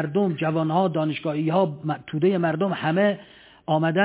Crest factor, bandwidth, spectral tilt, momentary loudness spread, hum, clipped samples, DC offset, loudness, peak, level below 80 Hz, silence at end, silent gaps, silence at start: 16 dB; 4 kHz; -11 dB/octave; 6 LU; none; under 0.1%; under 0.1%; -23 LUFS; -8 dBFS; -66 dBFS; 0 s; none; 0 s